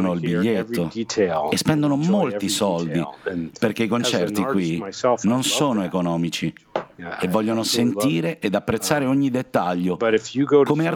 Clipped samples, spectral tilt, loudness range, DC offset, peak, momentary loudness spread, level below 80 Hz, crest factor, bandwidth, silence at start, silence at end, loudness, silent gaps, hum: under 0.1%; -5 dB/octave; 1 LU; under 0.1%; -4 dBFS; 6 LU; -58 dBFS; 18 dB; 19 kHz; 0 s; 0 s; -22 LUFS; none; none